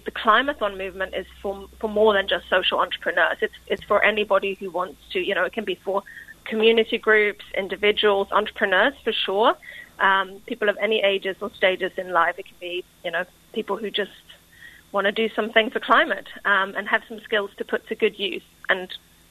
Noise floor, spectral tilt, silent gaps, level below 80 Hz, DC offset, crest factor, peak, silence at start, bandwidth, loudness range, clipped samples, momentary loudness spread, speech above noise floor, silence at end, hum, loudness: -48 dBFS; -4.5 dB/octave; none; -56 dBFS; under 0.1%; 20 dB; -2 dBFS; 0.05 s; 13.5 kHz; 5 LU; under 0.1%; 12 LU; 25 dB; 0.35 s; none; -22 LUFS